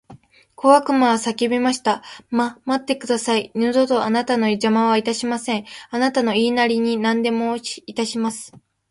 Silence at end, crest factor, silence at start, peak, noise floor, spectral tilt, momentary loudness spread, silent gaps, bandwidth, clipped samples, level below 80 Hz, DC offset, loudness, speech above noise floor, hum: 0.35 s; 18 dB; 0.1 s; 0 dBFS; -47 dBFS; -4 dB/octave; 9 LU; none; 11.5 kHz; under 0.1%; -64 dBFS; under 0.1%; -20 LUFS; 28 dB; none